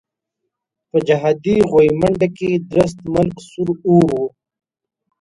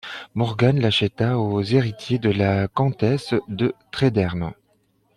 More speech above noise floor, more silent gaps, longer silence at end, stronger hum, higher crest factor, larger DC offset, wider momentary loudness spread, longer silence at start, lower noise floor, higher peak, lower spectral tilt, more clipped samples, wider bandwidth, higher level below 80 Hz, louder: first, 62 dB vs 44 dB; neither; first, 0.95 s vs 0.65 s; neither; about the same, 16 dB vs 16 dB; neither; first, 9 LU vs 6 LU; first, 0.95 s vs 0.05 s; first, -78 dBFS vs -64 dBFS; first, 0 dBFS vs -4 dBFS; about the same, -7.5 dB/octave vs -7 dB/octave; neither; about the same, 11.5 kHz vs 11 kHz; first, -46 dBFS vs -52 dBFS; first, -16 LUFS vs -21 LUFS